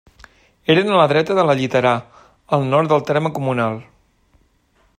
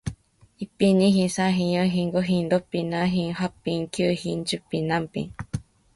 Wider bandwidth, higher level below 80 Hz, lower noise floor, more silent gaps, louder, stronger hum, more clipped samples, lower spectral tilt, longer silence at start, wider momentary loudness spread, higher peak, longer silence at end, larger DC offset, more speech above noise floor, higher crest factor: first, 14.5 kHz vs 11.5 kHz; second, -58 dBFS vs -52 dBFS; first, -59 dBFS vs -48 dBFS; neither; first, -17 LUFS vs -24 LUFS; neither; neither; about the same, -6.5 dB/octave vs -6 dB/octave; first, 0.7 s vs 0.05 s; second, 9 LU vs 14 LU; first, 0 dBFS vs -8 dBFS; first, 1.15 s vs 0.35 s; neither; first, 43 dB vs 25 dB; about the same, 18 dB vs 16 dB